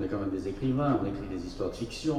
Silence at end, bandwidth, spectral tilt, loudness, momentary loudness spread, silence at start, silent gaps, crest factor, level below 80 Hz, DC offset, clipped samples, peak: 0 s; 12 kHz; -7 dB/octave; -32 LUFS; 8 LU; 0 s; none; 16 dB; -48 dBFS; under 0.1%; under 0.1%; -16 dBFS